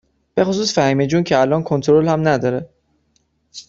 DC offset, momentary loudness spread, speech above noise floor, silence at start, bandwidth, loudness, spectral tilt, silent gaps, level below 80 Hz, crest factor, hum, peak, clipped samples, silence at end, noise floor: under 0.1%; 9 LU; 48 dB; 0.35 s; 7.8 kHz; -17 LUFS; -6 dB/octave; none; -52 dBFS; 16 dB; none; -2 dBFS; under 0.1%; 0.1 s; -64 dBFS